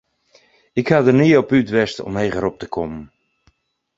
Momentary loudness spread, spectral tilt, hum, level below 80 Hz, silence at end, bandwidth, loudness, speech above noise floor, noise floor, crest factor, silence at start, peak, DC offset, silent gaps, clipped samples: 13 LU; -7 dB/octave; none; -48 dBFS; 0.9 s; 7.8 kHz; -18 LUFS; 45 dB; -61 dBFS; 18 dB; 0.75 s; 0 dBFS; under 0.1%; none; under 0.1%